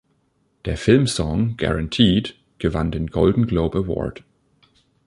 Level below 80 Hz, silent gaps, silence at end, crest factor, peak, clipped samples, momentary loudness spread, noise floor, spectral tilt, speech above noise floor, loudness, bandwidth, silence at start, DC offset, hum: -36 dBFS; none; 0.95 s; 20 dB; -2 dBFS; under 0.1%; 11 LU; -65 dBFS; -6 dB/octave; 46 dB; -20 LUFS; 11.5 kHz; 0.65 s; under 0.1%; none